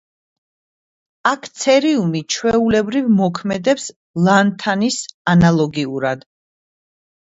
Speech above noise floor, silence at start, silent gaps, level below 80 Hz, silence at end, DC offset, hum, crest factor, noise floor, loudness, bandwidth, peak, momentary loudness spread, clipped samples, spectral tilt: over 74 dB; 1.25 s; 3.96-4.14 s, 5.14-5.25 s; -48 dBFS; 1.15 s; under 0.1%; none; 18 dB; under -90 dBFS; -17 LUFS; 8 kHz; 0 dBFS; 8 LU; under 0.1%; -5.5 dB/octave